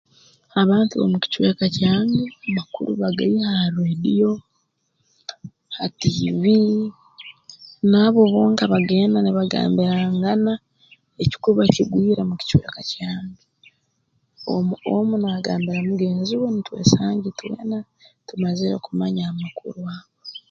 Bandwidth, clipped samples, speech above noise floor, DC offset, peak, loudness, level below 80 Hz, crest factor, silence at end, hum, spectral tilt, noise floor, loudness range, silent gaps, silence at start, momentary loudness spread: 7.4 kHz; under 0.1%; 51 dB; under 0.1%; 0 dBFS; -20 LUFS; -50 dBFS; 20 dB; 0.1 s; none; -6.5 dB/octave; -70 dBFS; 6 LU; none; 0.55 s; 15 LU